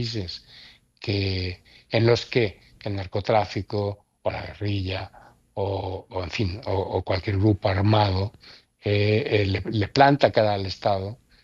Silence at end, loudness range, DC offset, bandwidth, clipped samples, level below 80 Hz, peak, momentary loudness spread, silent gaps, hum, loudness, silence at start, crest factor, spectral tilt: 0.3 s; 7 LU; under 0.1%; 7.4 kHz; under 0.1%; -54 dBFS; -2 dBFS; 13 LU; none; none; -24 LUFS; 0 s; 22 dB; -7 dB/octave